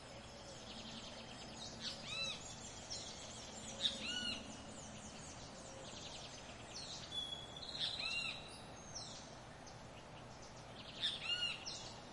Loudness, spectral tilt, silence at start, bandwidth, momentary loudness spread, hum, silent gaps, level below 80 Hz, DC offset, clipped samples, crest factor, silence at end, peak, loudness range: -45 LUFS; -2 dB/octave; 0 s; 11.5 kHz; 15 LU; none; none; -66 dBFS; under 0.1%; under 0.1%; 26 dB; 0 s; -22 dBFS; 4 LU